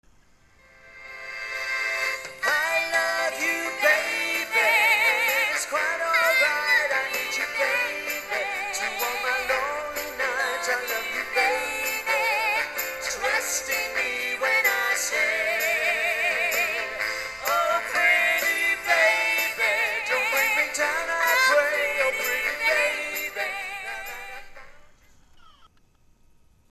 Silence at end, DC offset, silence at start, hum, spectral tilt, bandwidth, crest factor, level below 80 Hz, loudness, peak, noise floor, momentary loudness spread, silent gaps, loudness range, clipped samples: 1.05 s; under 0.1%; 0.85 s; none; 0.5 dB/octave; 13.5 kHz; 18 dB; -58 dBFS; -23 LUFS; -8 dBFS; -59 dBFS; 9 LU; none; 5 LU; under 0.1%